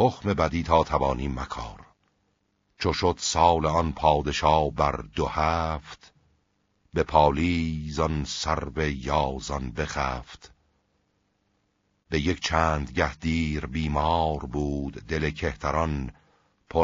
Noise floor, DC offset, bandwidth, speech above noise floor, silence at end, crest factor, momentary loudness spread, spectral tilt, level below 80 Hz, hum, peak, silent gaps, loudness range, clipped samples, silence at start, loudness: -72 dBFS; under 0.1%; 7.6 kHz; 46 dB; 0 s; 22 dB; 10 LU; -4.5 dB/octave; -40 dBFS; none; -4 dBFS; none; 6 LU; under 0.1%; 0 s; -26 LUFS